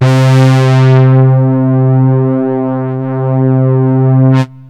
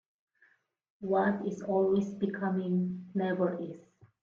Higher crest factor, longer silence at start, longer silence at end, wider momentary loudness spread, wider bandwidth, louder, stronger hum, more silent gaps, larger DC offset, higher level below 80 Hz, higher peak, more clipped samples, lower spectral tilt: second, 8 dB vs 16 dB; second, 0 s vs 1 s; second, 0.05 s vs 0.4 s; second, 8 LU vs 12 LU; about the same, 7.8 kHz vs 7.2 kHz; first, -9 LUFS vs -31 LUFS; neither; neither; first, 0.5% vs under 0.1%; first, -56 dBFS vs -72 dBFS; first, 0 dBFS vs -18 dBFS; neither; about the same, -8.5 dB/octave vs -8.5 dB/octave